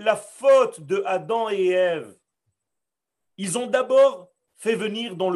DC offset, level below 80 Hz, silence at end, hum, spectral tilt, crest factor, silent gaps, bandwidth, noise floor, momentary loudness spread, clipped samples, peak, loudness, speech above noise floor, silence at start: under 0.1%; -80 dBFS; 0 s; none; -4 dB/octave; 16 dB; none; 12.5 kHz; -85 dBFS; 11 LU; under 0.1%; -6 dBFS; -22 LUFS; 64 dB; 0 s